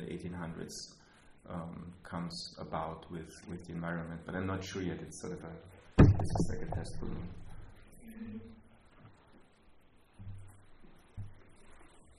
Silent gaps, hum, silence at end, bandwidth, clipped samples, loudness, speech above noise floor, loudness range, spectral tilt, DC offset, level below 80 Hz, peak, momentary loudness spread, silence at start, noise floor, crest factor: none; none; 0.05 s; 12 kHz; under 0.1%; -36 LUFS; 27 dB; 21 LU; -7 dB/octave; under 0.1%; -46 dBFS; -8 dBFS; 19 LU; 0 s; -61 dBFS; 30 dB